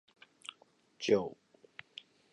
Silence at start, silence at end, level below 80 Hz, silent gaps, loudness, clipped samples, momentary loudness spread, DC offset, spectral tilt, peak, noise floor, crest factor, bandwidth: 1 s; 1 s; -76 dBFS; none; -34 LUFS; under 0.1%; 22 LU; under 0.1%; -4.5 dB/octave; -14 dBFS; -67 dBFS; 24 dB; 11 kHz